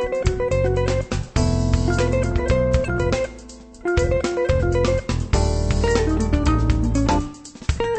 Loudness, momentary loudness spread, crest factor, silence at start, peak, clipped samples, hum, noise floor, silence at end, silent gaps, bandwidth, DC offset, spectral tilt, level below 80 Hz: -21 LUFS; 5 LU; 16 dB; 0 s; -4 dBFS; under 0.1%; none; -40 dBFS; 0 s; none; 8.8 kHz; under 0.1%; -6.5 dB/octave; -26 dBFS